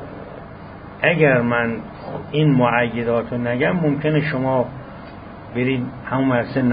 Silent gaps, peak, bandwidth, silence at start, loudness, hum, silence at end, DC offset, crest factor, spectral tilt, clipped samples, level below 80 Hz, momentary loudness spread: none; -2 dBFS; 5 kHz; 0 s; -19 LUFS; none; 0 s; under 0.1%; 18 dB; -12 dB/octave; under 0.1%; -46 dBFS; 21 LU